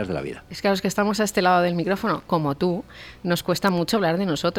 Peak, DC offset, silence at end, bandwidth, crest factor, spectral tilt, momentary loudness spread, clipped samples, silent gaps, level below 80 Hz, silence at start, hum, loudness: -6 dBFS; under 0.1%; 0 s; 17 kHz; 16 dB; -5 dB/octave; 11 LU; under 0.1%; none; -52 dBFS; 0 s; none; -23 LUFS